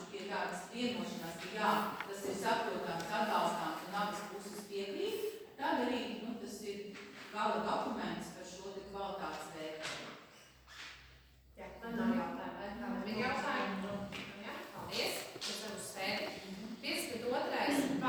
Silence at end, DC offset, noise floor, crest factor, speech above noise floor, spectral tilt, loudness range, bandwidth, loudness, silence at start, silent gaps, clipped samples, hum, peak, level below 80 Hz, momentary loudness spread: 0 s; under 0.1%; -62 dBFS; 20 dB; 23 dB; -4 dB/octave; 6 LU; over 20 kHz; -39 LUFS; 0 s; none; under 0.1%; none; -20 dBFS; -68 dBFS; 12 LU